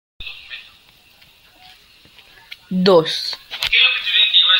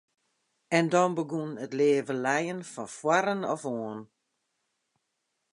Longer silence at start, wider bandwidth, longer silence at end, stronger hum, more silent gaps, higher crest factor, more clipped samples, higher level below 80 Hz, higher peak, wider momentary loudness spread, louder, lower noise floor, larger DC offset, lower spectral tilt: second, 0.2 s vs 0.7 s; first, 16.5 kHz vs 11.5 kHz; second, 0 s vs 1.45 s; neither; neither; about the same, 18 dB vs 22 dB; neither; first, -52 dBFS vs -80 dBFS; first, -2 dBFS vs -8 dBFS; first, 21 LU vs 12 LU; first, -14 LUFS vs -28 LUFS; second, -50 dBFS vs -80 dBFS; neither; about the same, -4 dB/octave vs -5 dB/octave